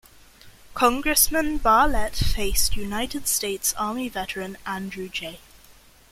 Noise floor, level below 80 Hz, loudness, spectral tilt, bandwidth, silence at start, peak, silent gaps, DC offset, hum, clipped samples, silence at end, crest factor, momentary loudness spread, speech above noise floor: -52 dBFS; -34 dBFS; -23 LUFS; -2.5 dB/octave; 16.5 kHz; 0.45 s; -4 dBFS; none; under 0.1%; none; under 0.1%; 0.75 s; 20 dB; 13 LU; 29 dB